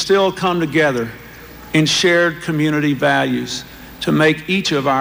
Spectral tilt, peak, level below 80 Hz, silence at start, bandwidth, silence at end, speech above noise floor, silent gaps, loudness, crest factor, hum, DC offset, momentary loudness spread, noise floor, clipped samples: -4.5 dB/octave; -2 dBFS; -48 dBFS; 0 s; 16.5 kHz; 0 s; 21 dB; none; -16 LUFS; 14 dB; none; under 0.1%; 14 LU; -37 dBFS; under 0.1%